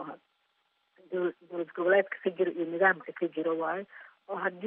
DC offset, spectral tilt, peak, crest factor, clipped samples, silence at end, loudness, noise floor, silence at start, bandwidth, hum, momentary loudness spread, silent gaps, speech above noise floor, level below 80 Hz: under 0.1%; -3.5 dB/octave; -12 dBFS; 20 dB; under 0.1%; 0 s; -30 LUFS; -75 dBFS; 0 s; 3.9 kHz; none; 14 LU; none; 45 dB; under -90 dBFS